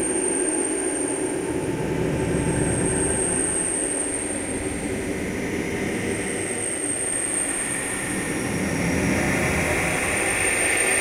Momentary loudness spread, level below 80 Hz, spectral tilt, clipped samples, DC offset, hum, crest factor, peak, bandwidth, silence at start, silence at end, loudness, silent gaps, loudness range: 6 LU; -42 dBFS; -3.5 dB/octave; under 0.1%; under 0.1%; none; 14 dB; -10 dBFS; 16 kHz; 0 s; 0 s; -23 LUFS; none; 3 LU